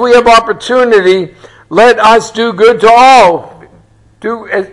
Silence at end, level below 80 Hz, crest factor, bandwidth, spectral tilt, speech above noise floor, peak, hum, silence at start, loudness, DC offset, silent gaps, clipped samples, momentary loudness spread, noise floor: 0.05 s; -40 dBFS; 8 dB; 12 kHz; -3.5 dB/octave; 36 dB; 0 dBFS; none; 0 s; -6 LUFS; under 0.1%; none; 2%; 15 LU; -43 dBFS